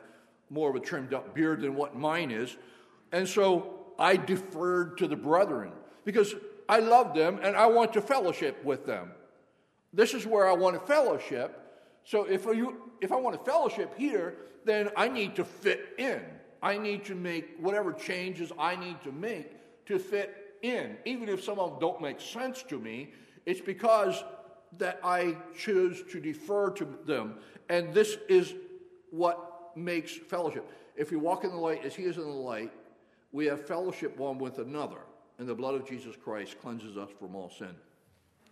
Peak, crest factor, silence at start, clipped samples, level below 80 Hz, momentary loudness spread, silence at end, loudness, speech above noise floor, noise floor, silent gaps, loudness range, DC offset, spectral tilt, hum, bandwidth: -8 dBFS; 22 dB; 0 s; under 0.1%; -82 dBFS; 16 LU; 0.75 s; -30 LUFS; 38 dB; -69 dBFS; none; 9 LU; under 0.1%; -5 dB/octave; none; 13.5 kHz